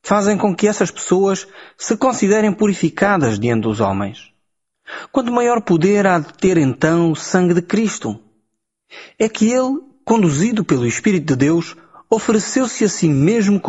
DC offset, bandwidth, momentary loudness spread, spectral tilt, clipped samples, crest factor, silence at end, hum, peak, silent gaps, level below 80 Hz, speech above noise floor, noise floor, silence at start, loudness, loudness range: under 0.1%; 8.2 kHz; 8 LU; -5.5 dB/octave; under 0.1%; 14 dB; 0 s; none; -2 dBFS; none; -52 dBFS; 56 dB; -72 dBFS; 0.05 s; -16 LUFS; 3 LU